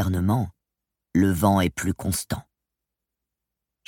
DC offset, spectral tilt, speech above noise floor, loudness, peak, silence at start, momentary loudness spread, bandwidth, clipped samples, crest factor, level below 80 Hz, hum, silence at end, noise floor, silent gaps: under 0.1%; -6 dB/octave; 63 dB; -24 LUFS; -6 dBFS; 0 s; 13 LU; 17 kHz; under 0.1%; 18 dB; -46 dBFS; none; 1.45 s; -85 dBFS; none